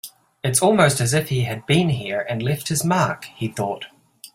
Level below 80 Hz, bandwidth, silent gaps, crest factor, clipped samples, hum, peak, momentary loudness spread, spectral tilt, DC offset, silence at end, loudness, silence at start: -54 dBFS; 16.5 kHz; none; 20 dB; under 0.1%; none; -2 dBFS; 12 LU; -4.5 dB/octave; under 0.1%; 0.05 s; -20 LUFS; 0.05 s